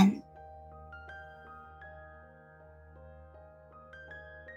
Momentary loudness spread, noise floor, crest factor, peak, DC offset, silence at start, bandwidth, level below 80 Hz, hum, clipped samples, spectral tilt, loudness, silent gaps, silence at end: 8 LU; -55 dBFS; 26 dB; -10 dBFS; under 0.1%; 0 s; 7.6 kHz; -60 dBFS; none; under 0.1%; -7.5 dB/octave; -41 LUFS; none; 0 s